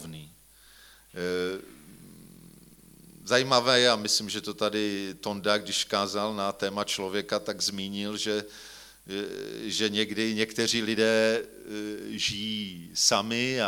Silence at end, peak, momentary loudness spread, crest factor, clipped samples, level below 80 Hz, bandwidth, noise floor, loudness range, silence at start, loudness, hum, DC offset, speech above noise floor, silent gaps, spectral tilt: 0 s; -4 dBFS; 14 LU; 24 dB; under 0.1%; -64 dBFS; 19 kHz; -56 dBFS; 5 LU; 0 s; -27 LUFS; none; under 0.1%; 27 dB; none; -2.5 dB/octave